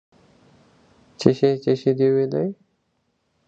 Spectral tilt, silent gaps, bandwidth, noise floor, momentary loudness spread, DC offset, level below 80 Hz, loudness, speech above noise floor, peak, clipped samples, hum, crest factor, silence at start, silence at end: -7.5 dB/octave; none; 8 kHz; -70 dBFS; 7 LU; under 0.1%; -60 dBFS; -21 LUFS; 51 dB; 0 dBFS; under 0.1%; none; 22 dB; 1.2 s; 0.95 s